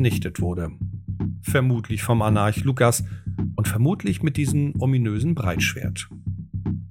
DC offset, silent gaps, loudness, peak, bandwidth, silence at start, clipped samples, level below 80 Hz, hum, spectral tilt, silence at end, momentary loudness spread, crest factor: under 0.1%; none; -23 LUFS; -2 dBFS; 18 kHz; 0 s; under 0.1%; -44 dBFS; none; -6 dB/octave; 0 s; 11 LU; 20 dB